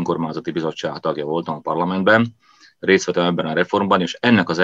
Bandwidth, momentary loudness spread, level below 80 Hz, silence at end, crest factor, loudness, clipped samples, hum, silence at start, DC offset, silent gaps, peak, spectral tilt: 7.8 kHz; 9 LU; -64 dBFS; 0 s; 18 dB; -19 LUFS; under 0.1%; none; 0 s; under 0.1%; none; 0 dBFS; -5.5 dB/octave